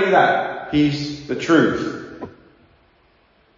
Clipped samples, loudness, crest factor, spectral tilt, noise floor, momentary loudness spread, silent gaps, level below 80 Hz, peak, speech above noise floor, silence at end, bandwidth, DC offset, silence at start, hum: under 0.1%; -19 LUFS; 20 dB; -6 dB/octave; -57 dBFS; 19 LU; none; -52 dBFS; -2 dBFS; 40 dB; 1.25 s; 7.6 kHz; under 0.1%; 0 s; none